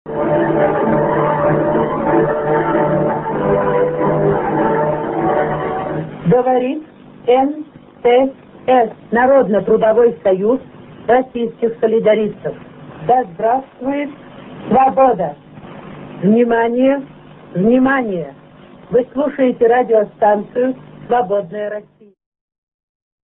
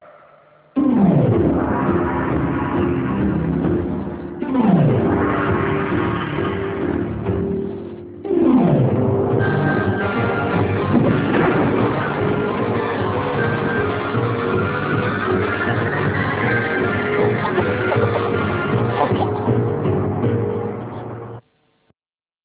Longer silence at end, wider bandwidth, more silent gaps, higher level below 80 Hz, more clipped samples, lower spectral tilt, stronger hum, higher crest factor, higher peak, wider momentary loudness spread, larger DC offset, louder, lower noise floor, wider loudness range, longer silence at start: first, 1.4 s vs 1.05 s; about the same, 3.9 kHz vs 4 kHz; neither; second, -46 dBFS vs -38 dBFS; neither; about the same, -12 dB/octave vs -11.5 dB/octave; neither; about the same, 16 dB vs 16 dB; first, 0 dBFS vs -4 dBFS; first, 14 LU vs 7 LU; neither; first, -15 LUFS vs -19 LUFS; second, -40 dBFS vs under -90 dBFS; about the same, 3 LU vs 3 LU; about the same, 0.05 s vs 0.05 s